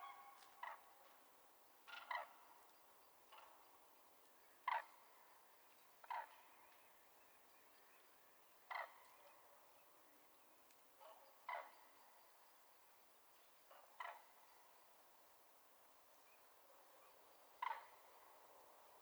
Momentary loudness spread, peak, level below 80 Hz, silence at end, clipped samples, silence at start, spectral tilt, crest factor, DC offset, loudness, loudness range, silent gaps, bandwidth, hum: 17 LU; -30 dBFS; under -90 dBFS; 0 s; under 0.1%; 0 s; 0 dB/octave; 28 dB; under 0.1%; -58 LUFS; 8 LU; none; over 20 kHz; none